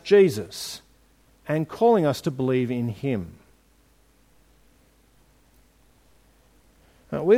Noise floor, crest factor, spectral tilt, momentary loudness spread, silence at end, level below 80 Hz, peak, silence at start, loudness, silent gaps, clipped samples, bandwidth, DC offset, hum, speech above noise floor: -60 dBFS; 20 dB; -6.5 dB/octave; 16 LU; 0 s; -60 dBFS; -6 dBFS; 0.05 s; -24 LUFS; none; under 0.1%; 16 kHz; under 0.1%; none; 38 dB